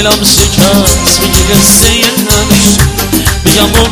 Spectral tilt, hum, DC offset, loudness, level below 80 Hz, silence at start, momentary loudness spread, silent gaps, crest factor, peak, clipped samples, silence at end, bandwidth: -3 dB/octave; none; under 0.1%; -6 LUFS; -16 dBFS; 0 s; 5 LU; none; 6 dB; 0 dBFS; 4%; 0 s; over 20 kHz